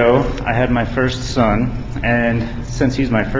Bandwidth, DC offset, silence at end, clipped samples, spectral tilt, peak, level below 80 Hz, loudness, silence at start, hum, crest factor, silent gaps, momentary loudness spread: 7.8 kHz; under 0.1%; 0 s; under 0.1%; -6.5 dB/octave; 0 dBFS; -28 dBFS; -18 LUFS; 0 s; none; 16 dB; none; 6 LU